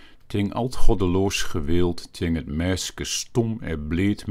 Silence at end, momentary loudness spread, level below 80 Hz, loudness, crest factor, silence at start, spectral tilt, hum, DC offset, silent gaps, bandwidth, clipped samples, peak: 0 s; 5 LU; -28 dBFS; -25 LUFS; 18 dB; 0.3 s; -5 dB/octave; none; under 0.1%; none; 13.5 kHz; under 0.1%; -2 dBFS